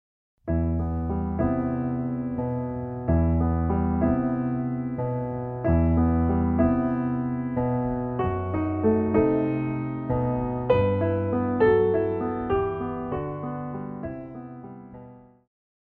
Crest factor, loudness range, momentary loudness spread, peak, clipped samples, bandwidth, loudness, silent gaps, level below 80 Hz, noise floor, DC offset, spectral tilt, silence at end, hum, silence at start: 16 dB; 4 LU; 11 LU; -8 dBFS; under 0.1%; 4.3 kHz; -25 LUFS; none; -36 dBFS; -47 dBFS; under 0.1%; -12 dB/octave; 0.7 s; none; 0.45 s